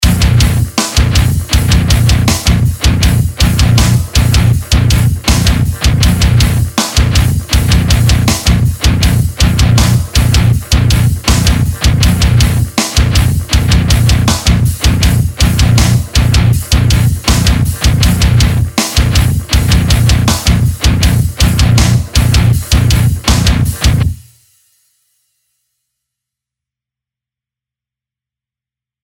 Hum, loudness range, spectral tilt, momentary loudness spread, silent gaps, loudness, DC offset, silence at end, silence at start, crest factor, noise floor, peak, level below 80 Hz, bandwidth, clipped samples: none; 1 LU; -4.5 dB/octave; 3 LU; none; -10 LUFS; under 0.1%; 4.85 s; 0 s; 10 dB; -87 dBFS; 0 dBFS; -16 dBFS; 17.5 kHz; under 0.1%